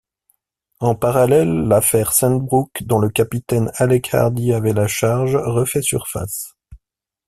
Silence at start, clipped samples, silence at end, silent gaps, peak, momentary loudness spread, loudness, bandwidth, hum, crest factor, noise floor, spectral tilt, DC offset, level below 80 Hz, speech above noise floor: 0.8 s; under 0.1%; 0.5 s; none; 0 dBFS; 8 LU; -17 LUFS; 16 kHz; none; 18 dB; -75 dBFS; -5.5 dB/octave; under 0.1%; -46 dBFS; 58 dB